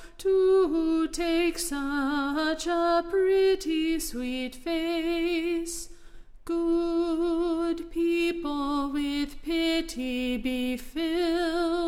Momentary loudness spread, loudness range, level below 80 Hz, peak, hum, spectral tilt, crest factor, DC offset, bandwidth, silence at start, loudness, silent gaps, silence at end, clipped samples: 8 LU; 3 LU; -46 dBFS; -14 dBFS; none; -3 dB/octave; 12 dB; under 0.1%; 16 kHz; 0 s; -27 LUFS; none; 0 s; under 0.1%